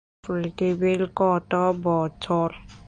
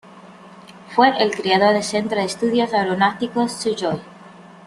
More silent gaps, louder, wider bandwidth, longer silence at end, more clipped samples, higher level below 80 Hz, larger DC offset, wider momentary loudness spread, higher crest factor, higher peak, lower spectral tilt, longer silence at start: neither; second, -24 LUFS vs -19 LUFS; second, 9.8 kHz vs 12.5 kHz; about the same, 0.05 s vs 0.05 s; neither; first, -52 dBFS vs -62 dBFS; neither; about the same, 7 LU vs 8 LU; about the same, 16 dB vs 18 dB; second, -8 dBFS vs -2 dBFS; first, -7.5 dB/octave vs -4.5 dB/octave; about the same, 0.25 s vs 0.15 s